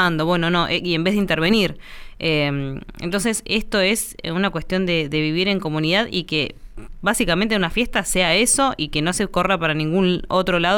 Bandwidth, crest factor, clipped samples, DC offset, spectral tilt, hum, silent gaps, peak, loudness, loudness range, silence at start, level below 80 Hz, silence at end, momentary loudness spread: 19 kHz; 16 dB; under 0.1%; under 0.1%; -4 dB/octave; none; none; -4 dBFS; -20 LUFS; 3 LU; 0 s; -38 dBFS; 0 s; 6 LU